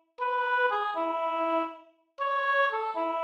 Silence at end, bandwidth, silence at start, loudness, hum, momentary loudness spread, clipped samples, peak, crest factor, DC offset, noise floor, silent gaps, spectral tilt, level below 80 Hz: 0 s; 8.2 kHz; 0.2 s; -28 LUFS; none; 6 LU; under 0.1%; -16 dBFS; 12 dB; under 0.1%; -50 dBFS; none; -2.5 dB/octave; -82 dBFS